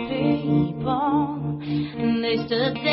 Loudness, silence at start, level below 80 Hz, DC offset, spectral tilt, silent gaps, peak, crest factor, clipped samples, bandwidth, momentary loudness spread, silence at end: -23 LUFS; 0 s; -50 dBFS; under 0.1%; -11 dB/octave; none; -10 dBFS; 14 dB; under 0.1%; 5.8 kHz; 5 LU; 0 s